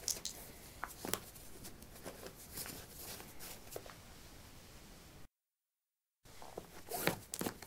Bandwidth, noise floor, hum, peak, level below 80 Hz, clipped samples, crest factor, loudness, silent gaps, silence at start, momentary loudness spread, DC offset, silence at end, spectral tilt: 17.5 kHz; under -90 dBFS; none; -12 dBFS; -64 dBFS; under 0.1%; 36 dB; -46 LUFS; none; 0 s; 18 LU; under 0.1%; 0 s; -2.5 dB/octave